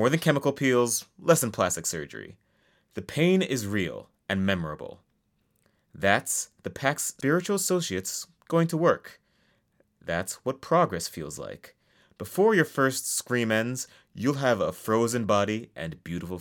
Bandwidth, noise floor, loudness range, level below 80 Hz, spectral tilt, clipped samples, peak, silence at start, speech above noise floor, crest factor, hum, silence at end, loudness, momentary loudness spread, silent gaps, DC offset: 18 kHz; -72 dBFS; 3 LU; -64 dBFS; -4.5 dB/octave; under 0.1%; -4 dBFS; 0 s; 45 dB; 22 dB; none; 0 s; -26 LUFS; 15 LU; none; under 0.1%